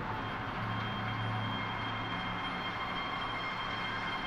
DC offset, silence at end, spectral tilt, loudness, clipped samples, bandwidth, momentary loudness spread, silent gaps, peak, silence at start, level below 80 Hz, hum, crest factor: under 0.1%; 0 s; -5.5 dB/octave; -36 LUFS; under 0.1%; 12.5 kHz; 1 LU; none; -24 dBFS; 0 s; -54 dBFS; none; 14 dB